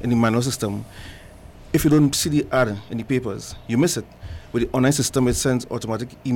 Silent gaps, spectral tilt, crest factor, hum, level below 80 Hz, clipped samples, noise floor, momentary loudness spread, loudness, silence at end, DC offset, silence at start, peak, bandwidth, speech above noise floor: none; -5 dB/octave; 14 dB; none; -42 dBFS; under 0.1%; -42 dBFS; 15 LU; -21 LUFS; 0 s; under 0.1%; 0 s; -8 dBFS; 17.5 kHz; 21 dB